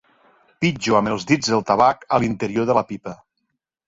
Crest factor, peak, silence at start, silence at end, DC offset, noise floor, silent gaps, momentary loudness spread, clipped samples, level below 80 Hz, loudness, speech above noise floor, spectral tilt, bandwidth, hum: 18 dB; -2 dBFS; 0.6 s; 0.75 s; under 0.1%; -76 dBFS; none; 8 LU; under 0.1%; -54 dBFS; -20 LUFS; 56 dB; -5 dB/octave; 7.8 kHz; none